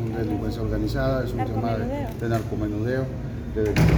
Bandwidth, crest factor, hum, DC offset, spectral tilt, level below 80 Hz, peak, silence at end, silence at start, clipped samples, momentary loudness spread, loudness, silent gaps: over 20 kHz; 18 dB; none; under 0.1%; -7.5 dB/octave; -34 dBFS; -6 dBFS; 0 s; 0 s; under 0.1%; 4 LU; -26 LUFS; none